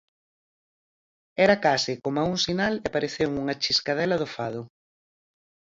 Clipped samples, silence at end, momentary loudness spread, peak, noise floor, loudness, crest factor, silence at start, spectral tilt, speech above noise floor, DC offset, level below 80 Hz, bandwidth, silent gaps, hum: under 0.1%; 1.1 s; 11 LU; -6 dBFS; under -90 dBFS; -25 LUFS; 22 dB; 1.4 s; -4 dB/octave; over 65 dB; under 0.1%; -60 dBFS; 7.8 kHz; none; none